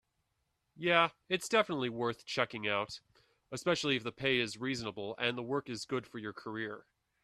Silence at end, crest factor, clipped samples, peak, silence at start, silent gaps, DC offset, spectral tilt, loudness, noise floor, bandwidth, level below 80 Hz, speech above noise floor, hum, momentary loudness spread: 0.45 s; 24 dB; under 0.1%; -12 dBFS; 0.75 s; none; under 0.1%; -4 dB/octave; -34 LUFS; -81 dBFS; 13.5 kHz; -72 dBFS; 47 dB; none; 13 LU